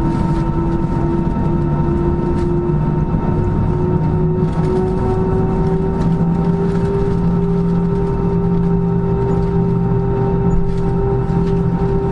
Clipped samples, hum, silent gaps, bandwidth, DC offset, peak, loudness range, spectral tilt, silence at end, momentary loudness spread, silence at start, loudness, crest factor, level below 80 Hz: under 0.1%; none; none; 6 kHz; under 0.1%; -2 dBFS; 1 LU; -10.5 dB/octave; 0 s; 1 LU; 0 s; -17 LUFS; 12 dB; -24 dBFS